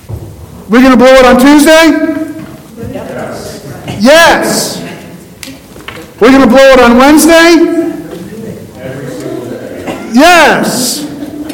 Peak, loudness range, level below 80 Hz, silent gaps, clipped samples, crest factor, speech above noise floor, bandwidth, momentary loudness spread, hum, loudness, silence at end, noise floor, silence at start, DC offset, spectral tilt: 0 dBFS; 5 LU; -32 dBFS; none; 10%; 8 dB; 24 dB; over 20 kHz; 22 LU; none; -4 LUFS; 0 s; -28 dBFS; 0.1 s; under 0.1%; -3.5 dB/octave